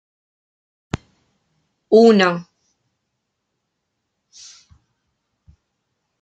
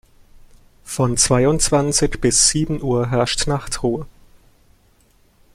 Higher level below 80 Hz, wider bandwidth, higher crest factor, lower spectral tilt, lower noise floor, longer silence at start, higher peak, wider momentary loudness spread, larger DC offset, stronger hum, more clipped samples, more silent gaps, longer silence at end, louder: second, -54 dBFS vs -36 dBFS; second, 8.2 kHz vs 15 kHz; about the same, 20 dB vs 20 dB; first, -6 dB/octave vs -3.5 dB/octave; first, -76 dBFS vs -56 dBFS; first, 1.9 s vs 0.85 s; about the same, -2 dBFS vs -2 dBFS; first, 20 LU vs 9 LU; neither; neither; neither; neither; first, 3.8 s vs 1.5 s; first, -14 LUFS vs -17 LUFS